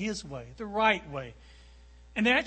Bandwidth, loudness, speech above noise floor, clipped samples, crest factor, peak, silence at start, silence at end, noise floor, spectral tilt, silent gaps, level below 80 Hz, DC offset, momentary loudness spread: 8.8 kHz; -30 LUFS; 23 dB; under 0.1%; 20 dB; -10 dBFS; 0 s; 0 s; -53 dBFS; -4 dB/octave; none; -54 dBFS; under 0.1%; 16 LU